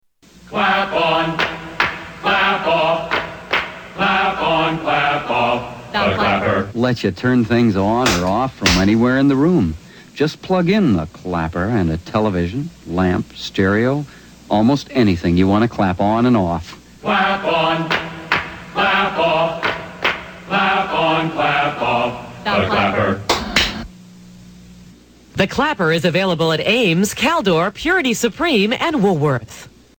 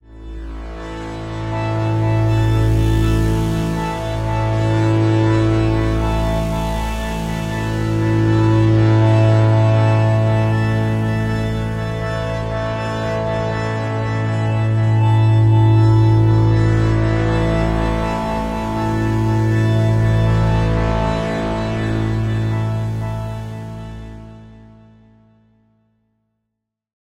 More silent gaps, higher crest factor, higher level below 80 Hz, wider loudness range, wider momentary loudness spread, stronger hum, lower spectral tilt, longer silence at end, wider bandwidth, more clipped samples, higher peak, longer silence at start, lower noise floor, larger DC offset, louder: neither; about the same, 18 dB vs 14 dB; second, -40 dBFS vs -28 dBFS; second, 3 LU vs 7 LU; second, 8 LU vs 11 LU; neither; second, -5 dB/octave vs -8 dB/octave; second, 0.3 s vs 2.4 s; first, 19.5 kHz vs 9.4 kHz; neither; about the same, 0 dBFS vs -2 dBFS; first, 0.45 s vs 0.1 s; second, -45 dBFS vs -78 dBFS; neither; about the same, -17 LUFS vs -17 LUFS